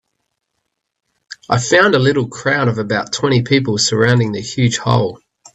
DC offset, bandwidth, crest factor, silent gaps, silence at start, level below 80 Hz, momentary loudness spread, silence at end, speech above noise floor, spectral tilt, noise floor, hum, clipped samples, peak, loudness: under 0.1%; 8.4 kHz; 16 dB; none; 1.3 s; -50 dBFS; 8 LU; 0.4 s; 59 dB; -4.5 dB/octave; -74 dBFS; none; under 0.1%; 0 dBFS; -15 LUFS